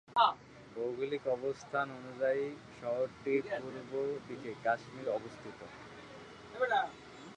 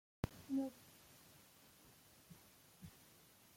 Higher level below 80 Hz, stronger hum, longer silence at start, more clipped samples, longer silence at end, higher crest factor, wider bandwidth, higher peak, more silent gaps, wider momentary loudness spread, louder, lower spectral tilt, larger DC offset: about the same, -72 dBFS vs -68 dBFS; neither; second, 0.1 s vs 0.25 s; neither; second, 0 s vs 0.55 s; second, 22 dB vs 28 dB; second, 10 kHz vs 16.5 kHz; first, -14 dBFS vs -24 dBFS; neither; second, 17 LU vs 21 LU; first, -36 LUFS vs -47 LUFS; about the same, -5 dB/octave vs -6 dB/octave; neither